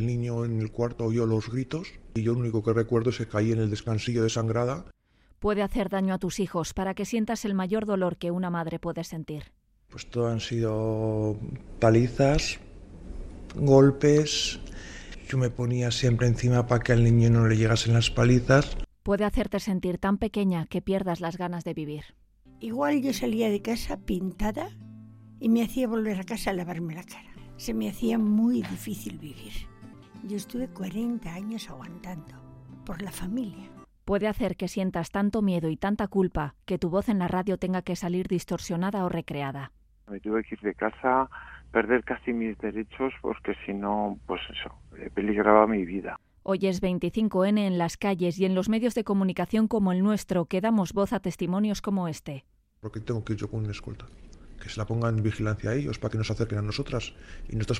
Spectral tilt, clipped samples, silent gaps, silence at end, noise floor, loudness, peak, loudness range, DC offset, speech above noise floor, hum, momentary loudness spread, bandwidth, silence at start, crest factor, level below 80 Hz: -6.5 dB/octave; under 0.1%; none; 0 s; -47 dBFS; -27 LUFS; -4 dBFS; 8 LU; under 0.1%; 21 dB; none; 17 LU; 15.5 kHz; 0 s; 24 dB; -44 dBFS